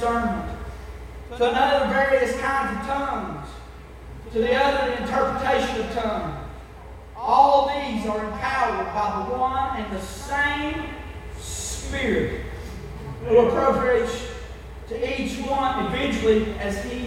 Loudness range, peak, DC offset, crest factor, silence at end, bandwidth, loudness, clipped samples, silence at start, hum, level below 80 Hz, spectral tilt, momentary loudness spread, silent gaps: 4 LU; -4 dBFS; under 0.1%; 20 dB; 0 s; 16 kHz; -23 LUFS; under 0.1%; 0 s; none; -38 dBFS; -5 dB/octave; 18 LU; none